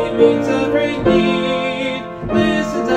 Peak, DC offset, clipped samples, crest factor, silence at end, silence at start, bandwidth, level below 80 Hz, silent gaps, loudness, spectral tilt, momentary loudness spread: 0 dBFS; under 0.1%; under 0.1%; 16 dB; 0 s; 0 s; 11 kHz; -40 dBFS; none; -16 LUFS; -6 dB/octave; 7 LU